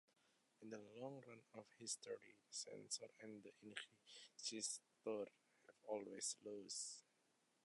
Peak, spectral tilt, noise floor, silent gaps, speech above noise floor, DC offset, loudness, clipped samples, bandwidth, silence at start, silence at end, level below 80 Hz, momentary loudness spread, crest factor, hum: -32 dBFS; -1.5 dB/octave; -83 dBFS; none; 30 dB; under 0.1%; -52 LUFS; under 0.1%; 11 kHz; 0.6 s; 0.65 s; under -90 dBFS; 13 LU; 24 dB; none